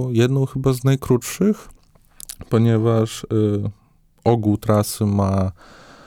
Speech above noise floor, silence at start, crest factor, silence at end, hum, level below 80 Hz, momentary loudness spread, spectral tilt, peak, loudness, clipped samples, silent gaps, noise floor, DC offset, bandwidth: 26 dB; 0 s; 16 dB; 0.55 s; none; -46 dBFS; 9 LU; -7 dB/octave; -4 dBFS; -20 LUFS; under 0.1%; none; -44 dBFS; under 0.1%; 17.5 kHz